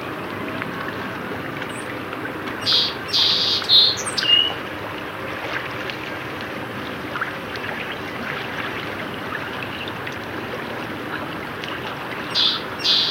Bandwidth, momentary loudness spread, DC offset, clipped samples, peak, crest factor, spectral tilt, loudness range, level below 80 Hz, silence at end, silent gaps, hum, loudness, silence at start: 16.5 kHz; 13 LU; under 0.1%; under 0.1%; -2 dBFS; 22 dB; -2.5 dB/octave; 11 LU; -54 dBFS; 0 s; none; none; -22 LUFS; 0 s